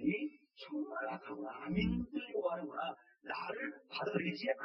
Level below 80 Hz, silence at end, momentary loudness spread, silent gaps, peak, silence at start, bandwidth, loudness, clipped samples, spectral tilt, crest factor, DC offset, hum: -58 dBFS; 0 s; 9 LU; none; -20 dBFS; 0 s; 6 kHz; -40 LUFS; under 0.1%; -8 dB/octave; 20 dB; under 0.1%; none